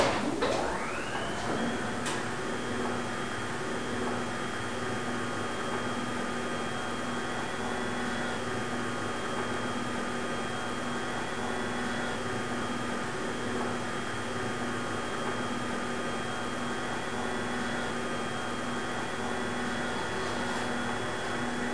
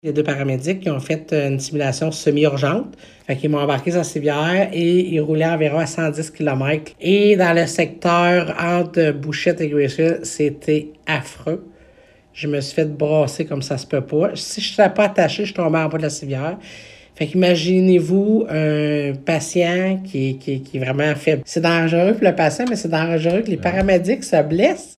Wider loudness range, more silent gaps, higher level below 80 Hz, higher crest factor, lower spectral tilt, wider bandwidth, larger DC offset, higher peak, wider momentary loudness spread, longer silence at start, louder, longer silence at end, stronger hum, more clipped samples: second, 1 LU vs 5 LU; neither; second, -56 dBFS vs -50 dBFS; about the same, 20 dB vs 18 dB; second, -4 dB/octave vs -6 dB/octave; second, 10.5 kHz vs 13.5 kHz; first, 1% vs under 0.1%; second, -12 dBFS vs 0 dBFS; second, 2 LU vs 8 LU; about the same, 0 s vs 0.05 s; second, -33 LUFS vs -18 LUFS; about the same, 0 s vs 0.05 s; neither; neither